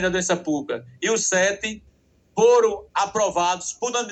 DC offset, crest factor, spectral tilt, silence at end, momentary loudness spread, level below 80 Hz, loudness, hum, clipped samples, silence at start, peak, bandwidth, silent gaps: under 0.1%; 16 dB; -2.5 dB/octave; 0 s; 12 LU; -56 dBFS; -22 LUFS; none; under 0.1%; 0 s; -6 dBFS; 9.4 kHz; none